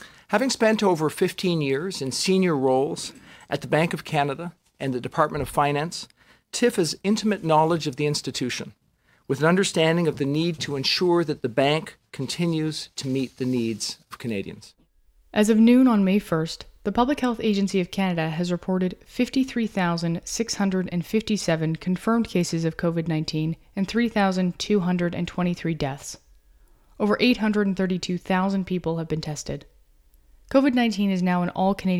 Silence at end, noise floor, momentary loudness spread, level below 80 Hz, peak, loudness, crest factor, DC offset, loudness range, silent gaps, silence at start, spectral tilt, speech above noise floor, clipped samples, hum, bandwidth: 0 s; -63 dBFS; 11 LU; -52 dBFS; -4 dBFS; -24 LUFS; 20 dB; under 0.1%; 4 LU; none; 0 s; -5.5 dB/octave; 40 dB; under 0.1%; none; 16 kHz